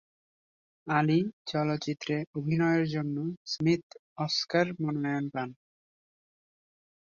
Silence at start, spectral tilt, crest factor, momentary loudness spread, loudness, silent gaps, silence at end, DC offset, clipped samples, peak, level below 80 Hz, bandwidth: 0.85 s; -6 dB/octave; 20 dB; 9 LU; -30 LUFS; 1.33-1.45 s, 2.27-2.33 s, 3.37-3.45 s, 3.83-3.90 s, 3.99-4.16 s; 1.65 s; under 0.1%; under 0.1%; -12 dBFS; -70 dBFS; 7.2 kHz